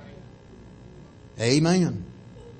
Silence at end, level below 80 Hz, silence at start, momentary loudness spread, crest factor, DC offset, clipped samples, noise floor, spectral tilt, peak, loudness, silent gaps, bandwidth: 0.05 s; -54 dBFS; 0 s; 26 LU; 18 dB; under 0.1%; under 0.1%; -47 dBFS; -5.5 dB/octave; -8 dBFS; -23 LUFS; none; 8.8 kHz